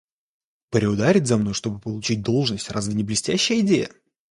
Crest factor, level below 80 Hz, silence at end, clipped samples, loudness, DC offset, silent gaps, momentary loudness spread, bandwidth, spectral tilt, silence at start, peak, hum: 18 dB; -52 dBFS; 0.45 s; under 0.1%; -22 LUFS; under 0.1%; none; 9 LU; 11.5 kHz; -5 dB/octave; 0.7 s; -4 dBFS; none